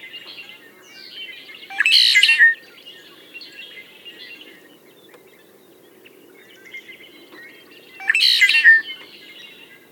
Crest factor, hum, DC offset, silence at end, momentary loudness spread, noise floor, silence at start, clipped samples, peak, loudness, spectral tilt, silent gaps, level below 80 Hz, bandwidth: 22 dB; none; under 0.1%; 0.95 s; 27 LU; -49 dBFS; 0.05 s; under 0.1%; 0 dBFS; -13 LUFS; 2.5 dB/octave; none; -88 dBFS; 18 kHz